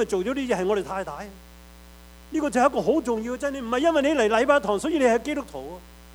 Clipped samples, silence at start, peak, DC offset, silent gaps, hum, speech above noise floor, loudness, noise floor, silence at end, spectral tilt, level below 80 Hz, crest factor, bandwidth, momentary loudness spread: under 0.1%; 0 s; -6 dBFS; under 0.1%; none; none; 23 dB; -23 LUFS; -47 dBFS; 0 s; -4.5 dB/octave; -50 dBFS; 18 dB; over 20 kHz; 16 LU